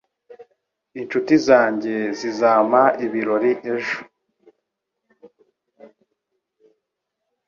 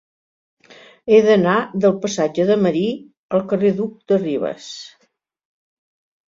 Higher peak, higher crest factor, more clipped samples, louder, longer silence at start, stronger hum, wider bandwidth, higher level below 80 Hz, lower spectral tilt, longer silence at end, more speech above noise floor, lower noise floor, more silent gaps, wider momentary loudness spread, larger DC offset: about the same, -2 dBFS vs -2 dBFS; about the same, 20 dB vs 18 dB; neither; about the same, -19 LUFS vs -18 LUFS; second, 0.3 s vs 1.05 s; neither; about the same, 7.2 kHz vs 7.6 kHz; second, -68 dBFS vs -62 dBFS; about the same, -5.5 dB/octave vs -6 dB/octave; first, 1.6 s vs 1.4 s; first, 61 dB vs 48 dB; first, -79 dBFS vs -65 dBFS; second, none vs 3.17-3.29 s; second, 12 LU vs 17 LU; neither